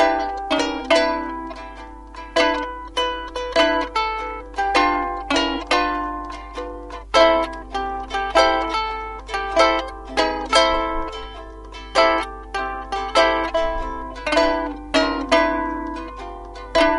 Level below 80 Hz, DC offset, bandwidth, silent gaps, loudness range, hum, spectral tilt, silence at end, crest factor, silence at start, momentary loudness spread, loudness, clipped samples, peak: -38 dBFS; under 0.1%; 11.5 kHz; none; 3 LU; none; -3 dB/octave; 0 s; 20 dB; 0 s; 15 LU; -20 LUFS; under 0.1%; 0 dBFS